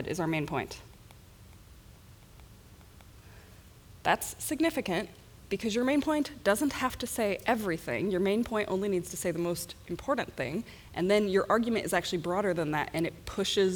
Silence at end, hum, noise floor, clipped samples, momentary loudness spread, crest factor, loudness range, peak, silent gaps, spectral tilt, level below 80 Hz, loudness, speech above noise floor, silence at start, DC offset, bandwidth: 0 s; none; -53 dBFS; under 0.1%; 8 LU; 20 dB; 8 LU; -12 dBFS; none; -4.5 dB/octave; -56 dBFS; -31 LUFS; 23 dB; 0 s; under 0.1%; over 20 kHz